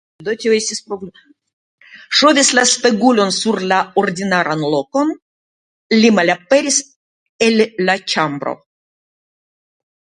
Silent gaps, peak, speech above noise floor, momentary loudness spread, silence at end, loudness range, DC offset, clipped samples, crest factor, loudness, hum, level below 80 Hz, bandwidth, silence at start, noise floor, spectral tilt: 1.53-1.78 s, 5.22-5.90 s, 6.96-7.39 s; 0 dBFS; over 75 dB; 13 LU; 1.6 s; 4 LU; under 0.1%; under 0.1%; 16 dB; -15 LUFS; none; -62 dBFS; 10.5 kHz; 0.2 s; under -90 dBFS; -3 dB/octave